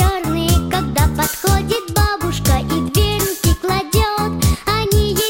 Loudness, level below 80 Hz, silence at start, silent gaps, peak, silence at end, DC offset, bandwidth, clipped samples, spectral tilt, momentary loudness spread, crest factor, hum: -17 LUFS; -22 dBFS; 0 s; none; -4 dBFS; 0 s; under 0.1%; 16.5 kHz; under 0.1%; -4.5 dB/octave; 2 LU; 12 dB; none